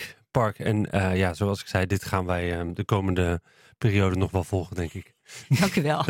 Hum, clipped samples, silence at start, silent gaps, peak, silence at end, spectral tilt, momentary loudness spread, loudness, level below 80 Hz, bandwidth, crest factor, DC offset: none; under 0.1%; 0 s; none; -6 dBFS; 0 s; -6.5 dB/octave; 10 LU; -26 LUFS; -52 dBFS; 16.5 kHz; 18 dB; under 0.1%